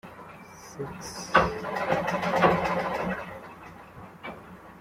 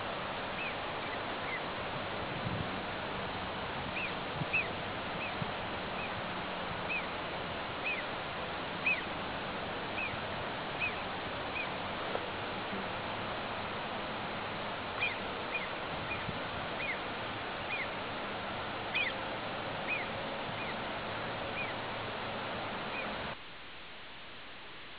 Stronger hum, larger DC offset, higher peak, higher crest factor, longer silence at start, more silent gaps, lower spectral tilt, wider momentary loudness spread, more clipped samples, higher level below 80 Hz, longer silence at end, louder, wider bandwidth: neither; neither; first, -4 dBFS vs -20 dBFS; first, 26 dB vs 18 dB; about the same, 0.05 s vs 0 s; neither; first, -5 dB/octave vs -2 dB/octave; first, 22 LU vs 4 LU; neither; first, -52 dBFS vs -58 dBFS; about the same, 0 s vs 0 s; first, -27 LUFS vs -37 LUFS; first, 16 kHz vs 4 kHz